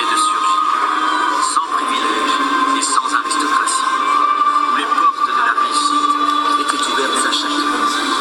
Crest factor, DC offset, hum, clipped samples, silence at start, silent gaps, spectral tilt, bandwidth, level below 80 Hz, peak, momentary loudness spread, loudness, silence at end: 14 dB; under 0.1%; none; under 0.1%; 0 s; none; 0.5 dB/octave; 16 kHz; -58 dBFS; -2 dBFS; 2 LU; -15 LUFS; 0 s